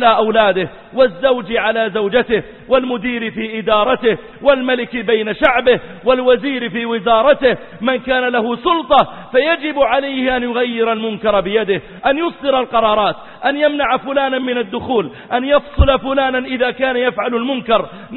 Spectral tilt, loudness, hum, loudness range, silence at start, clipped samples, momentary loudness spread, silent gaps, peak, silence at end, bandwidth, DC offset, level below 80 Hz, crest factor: -8.5 dB/octave; -16 LUFS; none; 2 LU; 0 s; under 0.1%; 7 LU; none; 0 dBFS; 0 s; 4.3 kHz; under 0.1%; -32 dBFS; 16 dB